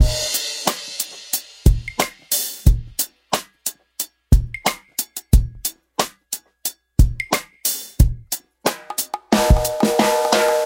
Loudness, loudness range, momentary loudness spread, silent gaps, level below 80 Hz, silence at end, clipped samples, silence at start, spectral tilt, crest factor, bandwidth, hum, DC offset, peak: -21 LUFS; 3 LU; 11 LU; none; -24 dBFS; 0 s; under 0.1%; 0 s; -4 dB/octave; 20 dB; 17 kHz; none; under 0.1%; 0 dBFS